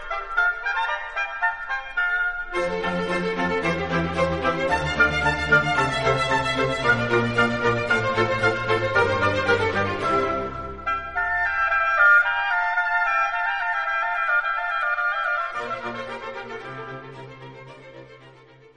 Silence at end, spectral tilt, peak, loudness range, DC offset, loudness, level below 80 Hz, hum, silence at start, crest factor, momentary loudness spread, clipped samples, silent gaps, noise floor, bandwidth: 0.05 s; -5 dB/octave; -6 dBFS; 5 LU; 0.5%; -22 LUFS; -44 dBFS; none; 0 s; 18 dB; 12 LU; under 0.1%; none; -49 dBFS; 10.5 kHz